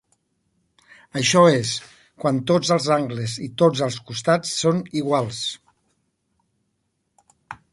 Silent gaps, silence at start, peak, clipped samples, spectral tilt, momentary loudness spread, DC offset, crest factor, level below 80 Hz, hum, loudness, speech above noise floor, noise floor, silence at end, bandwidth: none; 1.15 s; -2 dBFS; under 0.1%; -4.5 dB/octave; 13 LU; under 0.1%; 20 dB; -62 dBFS; none; -21 LUFS; 53 dB; -73 dBFS; 0.2 s; 11.5 kHz